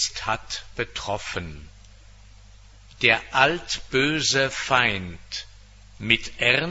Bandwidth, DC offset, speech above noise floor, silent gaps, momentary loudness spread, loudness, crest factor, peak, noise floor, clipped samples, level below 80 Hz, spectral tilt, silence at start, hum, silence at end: 8.2 kHz; under 0.1%; 24 dB; none; 14 LU; -23 LUFS; 24 dB; 0 dBFS; -48 dBFS; under 0.1%; -46 dBFS; -2.5 dB/octave; 0 s; none; 0 s